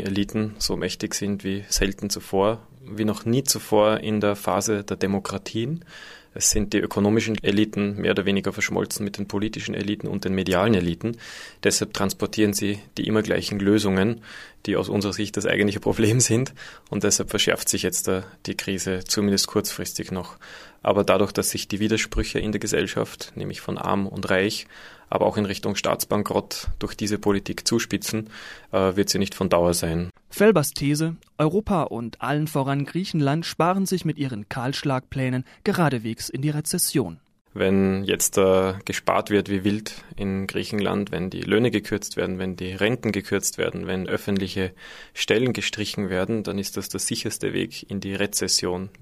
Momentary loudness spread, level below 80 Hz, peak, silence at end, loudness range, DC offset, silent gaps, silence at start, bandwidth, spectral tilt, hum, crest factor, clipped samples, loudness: 9 LU; -44 dBFS; -2 dBFS; 0.1 s; 3 LU; under 0.1%; 37.41-37.45 s; 0 s; 15.5 kHz; -4.5 dB/octave; none; 22 dB; under 0.1%; -24 LUFS